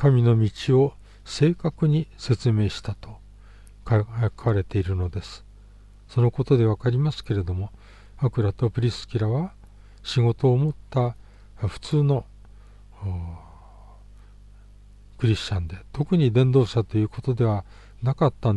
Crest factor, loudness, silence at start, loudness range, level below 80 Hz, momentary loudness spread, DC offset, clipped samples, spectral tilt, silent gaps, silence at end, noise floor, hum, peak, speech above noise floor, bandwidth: 16 dB; -24 LUFS; 0 s; 6 LU; -44 dBFS; 14 LU; under 0.1%; under 0.1%; -8 dB/octave; none; 0 s; -48 dBFS; 50 Hz at -45 dBFS; -6 dBFS; 25 dB; 9.6 kHz